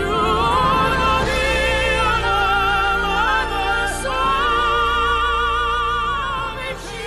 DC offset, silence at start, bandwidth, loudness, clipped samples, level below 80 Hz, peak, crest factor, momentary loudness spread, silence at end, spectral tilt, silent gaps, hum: under 0.1%; 0 s; 14 kHz; -18 LUFS; under 0.1%; -30 dBFS; -8 dBFS; 12 dB; 5 LU; 0 s; -4 dB/octave; none; none